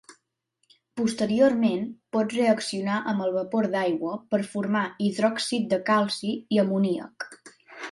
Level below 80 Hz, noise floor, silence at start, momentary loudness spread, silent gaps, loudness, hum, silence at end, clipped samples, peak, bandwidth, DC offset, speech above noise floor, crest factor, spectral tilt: -70 dBFS; -75 dBFS; 0.1 s; 9 LU; none; -25 LUFS; none; 0 s; under 0.1%; -8 dBFS; 11.5 kHz; under 0.1%; 50 dB; 18 dB; -5.5 dB/octave